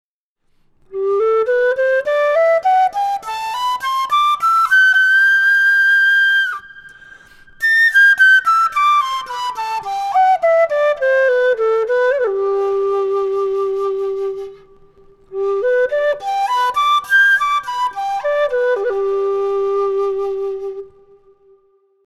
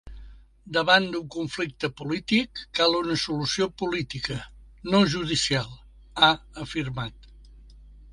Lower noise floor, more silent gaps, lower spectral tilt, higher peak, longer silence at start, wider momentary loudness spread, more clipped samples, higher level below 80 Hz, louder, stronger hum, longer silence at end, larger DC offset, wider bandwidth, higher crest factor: first, -64 dBFS vs -48 dBFS; neither; second, -1.5 dB/octave vs -4 dB/octave; about the same, -2 dBFS vs -4 dBFS; first, 0.9 s vs 0.05 s; about the same, 11 LU vs 13 LU; neither; second, -56 dBFS vs -50 dBFS; first, -15 LUFS vs -25 LUFS; neither; first, 1.2 s vs 0 s; neither; first, 15 kHz vs 11.5 kHz; second, 12 dB vs 24 dB